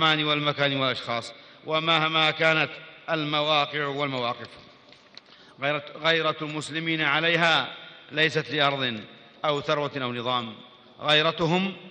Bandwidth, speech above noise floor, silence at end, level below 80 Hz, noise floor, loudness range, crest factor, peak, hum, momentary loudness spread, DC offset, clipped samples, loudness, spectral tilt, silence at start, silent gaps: 10 kHz; 27 dB; 0 s; -68 dBFS; -53 dBFS; 4 LU; 20 dB; -6 dBFS; none; 11 LU; under 0.1%; under 0.1%; -24 LUFS; -4.5 dB/octave; 0 s; none